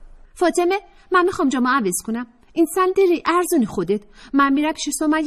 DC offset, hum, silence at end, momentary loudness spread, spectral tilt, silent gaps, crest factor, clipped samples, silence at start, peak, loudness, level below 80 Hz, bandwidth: under 0.1%; none; 0 s; 8 LU; -4 dB/octave; none; 14 dB; under 0.1%; 0 s; -6 dBFS; -20 LUFS; -50 dBFS; 14 kHz